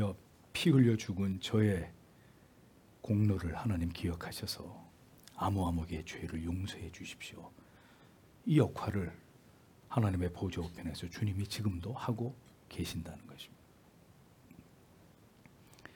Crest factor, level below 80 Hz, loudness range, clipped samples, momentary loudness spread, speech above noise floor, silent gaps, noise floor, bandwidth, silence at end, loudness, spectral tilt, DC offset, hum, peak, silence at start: 22 dB; -60 dBFS; 9 LU; under 0.1%; 21 LU; 28 dB; none; -62 dBFS; 18 kHz; 0.15 s; -36 LUFS; -6.5 dB/octave; under 0.1%; none; -16 dBFS; 0 s